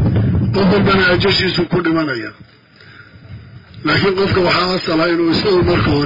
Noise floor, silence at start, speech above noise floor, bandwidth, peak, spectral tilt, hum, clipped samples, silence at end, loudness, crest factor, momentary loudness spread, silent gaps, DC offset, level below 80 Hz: -42 dBFS; 0 s; 28 dB; 5.4 kHz; -2 dBFS; -7 dB/octave; none; under 0.1%; 0 s; -14 LUFS; 12 dB; 6 LU; none; under 0.1%; -36 dBFS